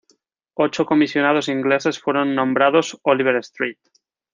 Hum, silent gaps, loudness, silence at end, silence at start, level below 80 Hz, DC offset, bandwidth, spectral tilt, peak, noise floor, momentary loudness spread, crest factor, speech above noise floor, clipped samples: none; none; -19 LUFS; 0.6 s; 0.6 s; -68 dBFS; under 0.1%; 9.6 kHz; -5 dB/octave; -2 dBFS; -63 dBFS; 8 LU; 18 dB; 45 dB; under 0.1%